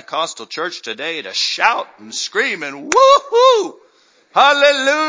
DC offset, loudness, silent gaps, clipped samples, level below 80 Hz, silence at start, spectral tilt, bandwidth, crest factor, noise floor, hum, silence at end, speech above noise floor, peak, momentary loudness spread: under 0.1%; -15 LUFS; none; under 0.1%; -66 dBFS; 0.1 s; -0.5 dB/octave; 7.8 kHz; 16 dB; -53 dBFS; none; 0 s; 38 dB; 0 dBFS; 14 LU